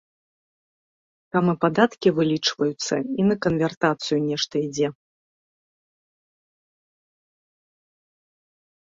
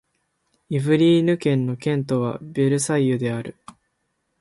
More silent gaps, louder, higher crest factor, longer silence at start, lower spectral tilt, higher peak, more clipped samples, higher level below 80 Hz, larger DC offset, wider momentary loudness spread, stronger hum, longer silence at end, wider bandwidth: first, 3.77-3.81 s vs none; about the same, -23 LUFS vs -21 LUFS; first, 22 dB vs 16 dB; first, 1.35 s vs 0.7 s; second, -5 dB/octave vs -6.5 dB/octave; about the same, -4 dBFS vs -6 dBFS; neither; about the same, -64 dBFS vs -62 dBFS; neither; second, 6 LU vs 10 LU; neither; first, 3.9 s vs 0.9 s; second, 7.8 kHz vs 11.5 kHz